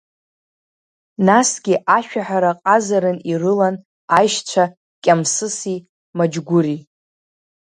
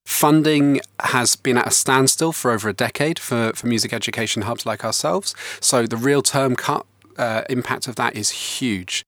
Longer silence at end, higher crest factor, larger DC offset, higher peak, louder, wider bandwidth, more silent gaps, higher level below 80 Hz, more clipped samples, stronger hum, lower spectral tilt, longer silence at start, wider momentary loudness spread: first, 0.9 s vs 0.05 s; about the same, 18 dB vs 18 dB; neither; about the same, 0 dBFS vs -2 dBFS; about the same, -17 LUFS vs -19 LUFS; second, 11 kHz vs over 20 kHz; first, 3.85-4.08 s, 4.77-5.02 s, 5.89-6.13 s vs none; about the same, -66 dBFS vs -64 dBFS; neither; neither; about the same, -4.5 dB/octave vs -3.5 dB/octave; first, 1.2 s vs 0.05 s; about the same, 10 LU vs 8 LU